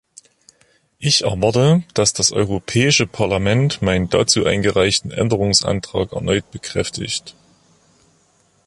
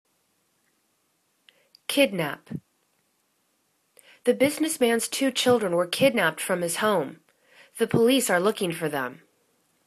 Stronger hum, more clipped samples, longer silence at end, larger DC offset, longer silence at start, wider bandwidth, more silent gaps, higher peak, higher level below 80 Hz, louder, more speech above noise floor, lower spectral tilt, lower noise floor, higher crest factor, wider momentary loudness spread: neither; neither; first, 1.35 s vs 0.7 s; neither; second, 1 s vs 1.9 s; second, 11.5 kHz vs 14 kHz; neither; first, 0 dBFS vs -8 dBFS; first, -40 dBFS vs -68 dBFS; first, -17 LUFS vs -24 LUFS; second, 41 dB vs 47 dB; about the same, -4 dB/octave vs -3.5 dB/octave; second, -58 dBFS vs -71 dBFS; about the same, 18 dB vs 20 dB; second, 8 LU vs 14 LU